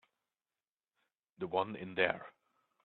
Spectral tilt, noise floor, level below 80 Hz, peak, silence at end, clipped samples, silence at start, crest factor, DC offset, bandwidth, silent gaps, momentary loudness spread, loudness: -7.5 dB/octave; under -90 dBFS; -82 dBFS; -14 dBFS; 0.55 s; under 0.1%; 1.4 s; 28 dB; under 0.1%; 4.4 kHz; none; 12 LU; -36 LUFS